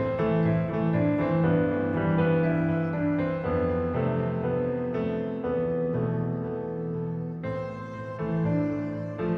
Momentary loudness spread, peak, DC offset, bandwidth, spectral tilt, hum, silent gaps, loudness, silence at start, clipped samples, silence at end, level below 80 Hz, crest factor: 9 LU; -12 dBFS; under 0.1%; 4.6 kHz; -10.5 dB/octave; none; none; -27 LUFS; 0 s; under 0.1%; 0 s; -50 dBFS; 14 dB